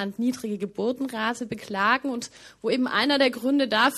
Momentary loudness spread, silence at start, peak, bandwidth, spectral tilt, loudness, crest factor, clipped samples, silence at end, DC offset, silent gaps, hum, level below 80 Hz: 11 LU; 0 s; -6 dBFS; 14 kHz; -4 dB/octave; -25 LUFS; 20 dB; under 0.1%; 0 s; under 0.1%; none; none; -66 dBFS